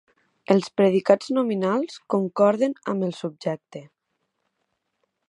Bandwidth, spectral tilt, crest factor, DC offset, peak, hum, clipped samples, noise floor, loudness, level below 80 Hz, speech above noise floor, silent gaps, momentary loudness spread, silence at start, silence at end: 11 kHz; -7 dB/octave; 22 dB; under 0.1%; -2 dBFS; none; under 0.1%; -76 dBFS; -23 LUFS; -76 dBFS; 54 dB; none; 11 LU; 0.5 s; 1.45 s